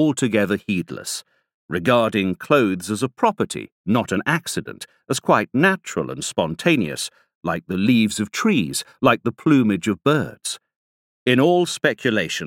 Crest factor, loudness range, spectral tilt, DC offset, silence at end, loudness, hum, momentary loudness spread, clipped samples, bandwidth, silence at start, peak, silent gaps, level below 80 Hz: 18 dB; 2 LU; -5 dB/octave; under 0.1%; 0 s; -21 LUFS; none; 11 LU; under 0.1%; 17 kHz; 0 s; -2 dBFS; 1.54-1.69 s, 3.72-3.84 s, 7.35-7.41 s, 10.76-11.26 s; -58 dBFS